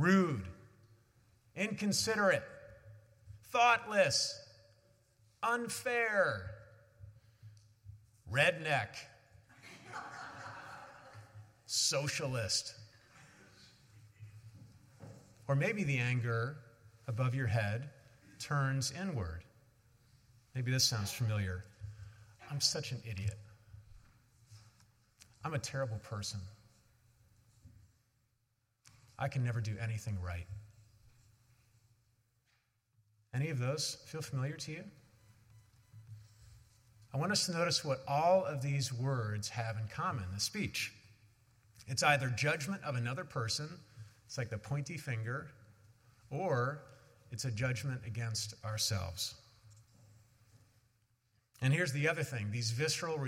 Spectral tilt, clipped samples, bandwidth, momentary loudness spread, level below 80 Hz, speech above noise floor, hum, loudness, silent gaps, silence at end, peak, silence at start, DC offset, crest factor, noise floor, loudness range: -4 dB/octave; under 0.1%; 16.5 kHz; 24 LU; -70 dBFS; 45 dB; none; -35 LUFS; none; 0 s; -14 dBFS; 0 s; under 0.1%; 24 dB; -80 dBFS; 10 LU